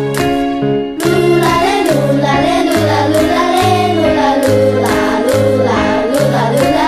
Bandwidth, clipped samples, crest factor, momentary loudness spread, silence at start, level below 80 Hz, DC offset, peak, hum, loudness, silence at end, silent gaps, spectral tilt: 14 kHz; under 0.1%; 10 dB; 3 LU; 0 s; -36 dBFS; under 0.1%; 0 dBFS; none; -12 LUFS; 0 s; none; -5.5 dB/octave